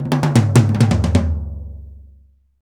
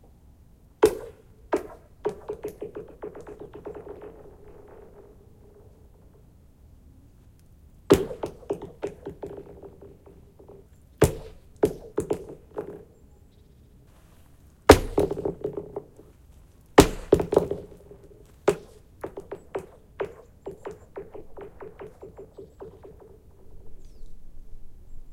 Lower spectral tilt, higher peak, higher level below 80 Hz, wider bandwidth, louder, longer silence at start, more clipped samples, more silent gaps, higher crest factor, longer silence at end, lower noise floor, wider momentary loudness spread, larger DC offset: first, -7 dB/octave vs -5.5 dB/octave; about the same, 0 dBFS vs 0 dBFS; first, -32 dBFS vs -44 dBFS; about the same, 16.5 kHz vs 16.5 kHz; first, -16 LUFS vs -26 LUFS; second, 0 s vs 0.8 s; neither; neither; second, 16 dB vs 30 dB; first, 0.65 s vs 0 s; second, -50 dBFS vs -54 dBFS; second, 20 LU vs 25 LU; neither